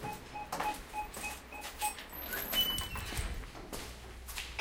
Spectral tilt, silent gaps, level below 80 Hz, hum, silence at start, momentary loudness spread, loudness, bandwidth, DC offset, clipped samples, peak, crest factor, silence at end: -2 dB/octave; none; -48 dBFS; none; 0 s; 14 LU; -38 LUFS; 17 kHz; under 0.1%; under 0.1%; -16 dBFS; 24 dB; 0 s